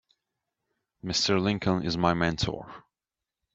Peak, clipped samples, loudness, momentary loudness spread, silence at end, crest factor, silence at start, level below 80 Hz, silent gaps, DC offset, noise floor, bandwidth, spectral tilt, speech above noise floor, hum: -8 dBFS; under 0.1%; -27 LUFS; 15 LU; 0.75 s; 22 dB; 1.05 s; -52 dBFS; none; under 0.1%; -90 dBFS; 8 kHz; -4.5 dB/octave; 63 dB; none